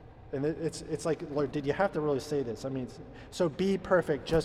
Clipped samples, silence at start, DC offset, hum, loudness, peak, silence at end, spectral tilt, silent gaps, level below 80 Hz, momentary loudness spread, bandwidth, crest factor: under 0.1%; 0 s; under 0.1%; none; -32 LUFS; -14 dBFS; 0 s; -6 dB/octave; none; -52 dBFS; 11 LU; 13.5 kHz; 18 dB